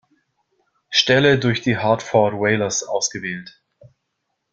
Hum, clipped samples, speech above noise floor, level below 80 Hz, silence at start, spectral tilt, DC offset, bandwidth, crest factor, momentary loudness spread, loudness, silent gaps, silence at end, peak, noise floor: none; under 0.1%; 57 dB; -58 dBFS; 0.9 s; -4 dB/octave; under 0.1%; 9.4 kHz; 20 dB; 10 LU; -18 LUFS; none; 1.05 s; -2 dBFS; -75 dBFS